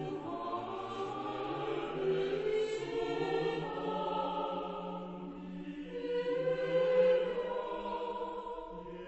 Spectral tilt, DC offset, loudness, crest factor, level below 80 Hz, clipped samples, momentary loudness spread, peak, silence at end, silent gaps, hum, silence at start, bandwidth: -6.5 dB/octave; under 0.1%; -36 LUFS; 16 dB; -62 dBFS; under 0.1%; 13 LU; -18 dBFS; 0 s; none; none; 0 s; 8.2 kHz